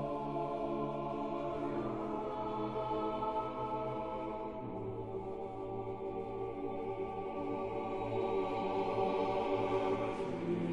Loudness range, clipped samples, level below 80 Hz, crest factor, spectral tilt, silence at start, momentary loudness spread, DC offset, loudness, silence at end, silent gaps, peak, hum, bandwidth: 5 LU; under 0.1%; -60 dBFS; 16 dB; -8 dB/octave; 0 s; 8 LU; 0.1%; -38 LUFS; 0 s; none; -22 dBFS; none; 10 kHz